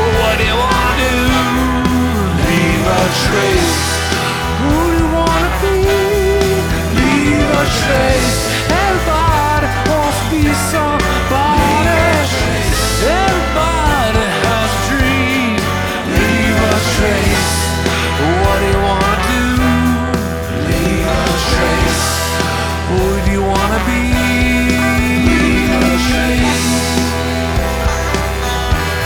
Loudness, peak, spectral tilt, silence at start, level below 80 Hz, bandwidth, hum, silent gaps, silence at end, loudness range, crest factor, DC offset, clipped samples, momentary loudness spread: -13 LUFS; 0 dBFS; -4.5 dB/octave; 0 s; -22 dBFS; over 20 kHz; none; none; 0 s; 1 LU; 12 dB; under 0.1%; under 0.1%; 4 LU